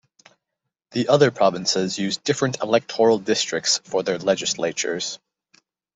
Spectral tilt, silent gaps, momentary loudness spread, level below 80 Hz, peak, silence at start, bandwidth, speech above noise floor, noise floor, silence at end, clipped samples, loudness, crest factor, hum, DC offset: -3.5 dB/octave; none; 8 LU; -66 dBFS; -2 dBFS; 0.9 s; 8.2 kHz; 61 dB; -82 dBFS; 0.8 s; under 0.1%; -21 LUFS; 20 dB; none; under 0.1%